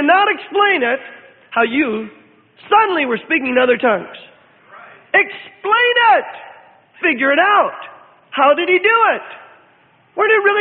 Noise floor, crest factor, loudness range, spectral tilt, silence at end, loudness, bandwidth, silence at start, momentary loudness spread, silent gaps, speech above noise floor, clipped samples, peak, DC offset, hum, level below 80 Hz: -52 dBFS; 16 dB; 2 LU; -8.5 dB/octave; 0 s; -14 LUFS; 4.6 kHz; 0 s; 14 LU; none; 38 dB; under 0.1%; 0 dBFS; under 0.1%; none; -68 dBFS